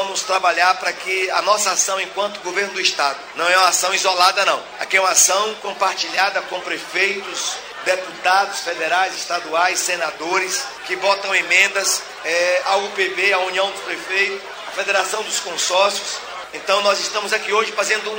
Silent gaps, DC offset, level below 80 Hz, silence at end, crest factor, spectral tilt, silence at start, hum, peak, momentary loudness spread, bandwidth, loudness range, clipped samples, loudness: none; under 0.1%; -66 dBFS; 0 s; 18 dB; 0.5 dB/octave; 0 s; none; 0 dBFS; 9 LU; 16.5 kHz; 4 LU; under 0.1%; -18 LUFS